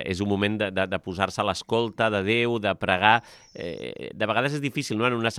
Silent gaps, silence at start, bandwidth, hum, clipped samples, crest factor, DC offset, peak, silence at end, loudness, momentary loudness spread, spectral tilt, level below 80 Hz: none; 0 s; 15 kHz; none; under 0.1%; 24 dB; under 0.1%; -2 dBFS; 0 s; -25 LUFS; 14 LU; -5 dB/octave; -62 dBFS